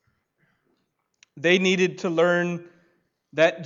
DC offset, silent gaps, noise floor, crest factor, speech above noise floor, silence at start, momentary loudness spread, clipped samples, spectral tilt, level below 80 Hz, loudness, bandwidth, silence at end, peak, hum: under 0.1%; none; -73 dBFS; 20 dB; 52 dB; 1.35 s; 12 LU; under 0.1%; -5 dB/octave; -74 dBFS; -22 LUFS; 7.6 kHz; 0 s; -6 dBFS; none